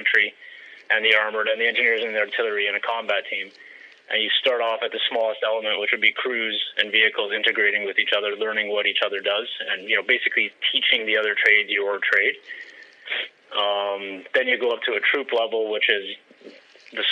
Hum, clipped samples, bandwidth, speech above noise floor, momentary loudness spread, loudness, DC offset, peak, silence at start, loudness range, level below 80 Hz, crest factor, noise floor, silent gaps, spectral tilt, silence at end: none; under 0.1%; 8.8 kHz; 24 dB; 10 LU; -21 LUFS; under 0.1%; -2 dBFS; 0 s; 4 LU; -86 dBFS; 22 dB; -47 dBFS; none; -2.5 dB/octave; 0 s